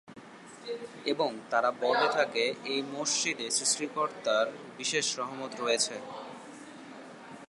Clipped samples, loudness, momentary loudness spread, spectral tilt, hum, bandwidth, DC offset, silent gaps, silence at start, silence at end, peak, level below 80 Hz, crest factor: under 0.1%; -30 LUFS; 20 LU; -1.5 dB/octave; none; 11.5 kHz; under 0.1%; none; 0.05 s; 0.05 s; -12 dBFS; -84 dBFS; 20 dB